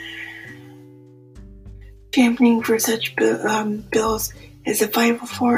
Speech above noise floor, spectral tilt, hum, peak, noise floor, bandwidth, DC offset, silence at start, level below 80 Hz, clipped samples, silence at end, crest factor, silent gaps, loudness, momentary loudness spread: 27 dB; -3.5 dB/octave; none; -4 dBFS; -45 dBFS; 16 kHz; under 0.1%; 0 s; -46 dBFS; under 0.1%; 0 s; 18 dB; none; -20 LUFS; 17 LU